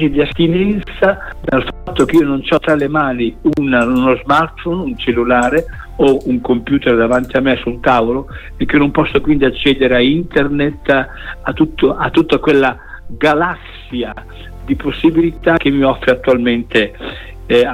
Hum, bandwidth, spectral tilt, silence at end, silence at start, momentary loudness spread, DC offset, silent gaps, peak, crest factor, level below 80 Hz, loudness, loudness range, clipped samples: none; 15 kHz; -6.5 dB/octave; 0 s; 0 s; 11 LU; under 0.1%; none; 0 dBFS; 14 dB; -32 dBFS; -14 LUFS; 2 LU; under 0.1%